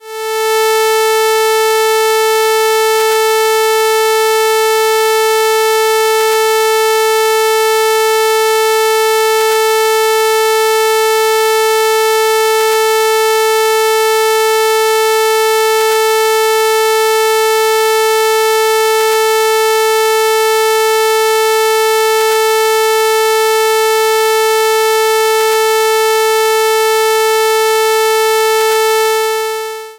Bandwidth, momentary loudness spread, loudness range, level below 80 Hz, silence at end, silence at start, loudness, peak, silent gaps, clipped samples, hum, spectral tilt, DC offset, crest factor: 16 kHz; 0 LU; 0 LU; -60 dBFS; 0.05 s; 0.05 s; -11 LUFS; -2 dBFS; none; under 0.1%; 60 Hz at -60 dBFS; 1 dB/octave; under 0.1%; 8 dB